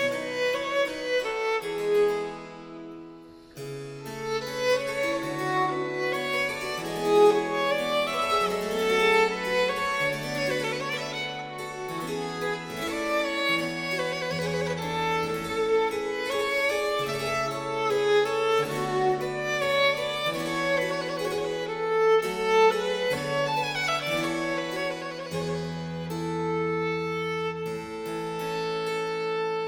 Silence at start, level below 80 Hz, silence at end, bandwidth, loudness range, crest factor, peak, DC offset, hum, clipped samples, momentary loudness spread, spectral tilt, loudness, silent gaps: 0 s; -58 dBFS; 0 s; 18.5 kHz; 5 LU; 18 dB; -8 dBFS; under 0.1%; none; under 0.1%; 10 LU; -4 dB/octave; -27 LUFS; none